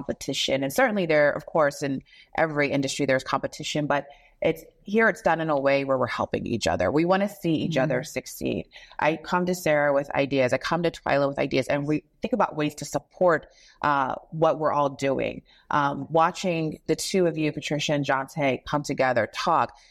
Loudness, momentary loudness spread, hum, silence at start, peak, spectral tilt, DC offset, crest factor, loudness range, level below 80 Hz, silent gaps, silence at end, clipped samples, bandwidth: -25 LUFS; 7 LU; none; 0 s; -8 dBFS; -5 dB/octave; under 0.1%; 16 dB; 2 LU; -56 dBFS; none; 0.2 s; under 0.1%; 15.5 kHz